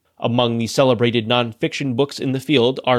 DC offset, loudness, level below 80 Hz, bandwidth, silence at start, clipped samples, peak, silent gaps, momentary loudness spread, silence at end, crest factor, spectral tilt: under 0.1%; -19 LUFS; -60 dBFS; 14.5 kHz; 0.2 s; under 0.1%; -2 dBFS; none; 6 LU; 0 s; 16 dB; -5.5 dB/octave